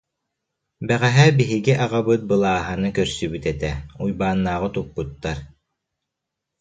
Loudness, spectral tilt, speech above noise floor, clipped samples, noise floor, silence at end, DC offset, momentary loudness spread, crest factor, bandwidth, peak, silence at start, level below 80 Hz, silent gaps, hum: -21 LUFS; -6 dB/octave; 62 dB; under 0.1%; -82 dBFS; 1.15 s; under 0.1%; 14 LU; 20 dB; 9.2 kHz; -2 dBFS; 0.8 s; -42 dBFS; none; none